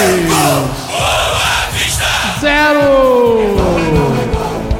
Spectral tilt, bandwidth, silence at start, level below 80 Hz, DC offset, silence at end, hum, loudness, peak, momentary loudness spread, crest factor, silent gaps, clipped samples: -4 dB/octave; 17 kHz; 0 s; -26 dBFS; under 0.1%; 0 s; none; -12 LUFS; 0 dBFS; 6 LU; 12 dB; none; under 0.1%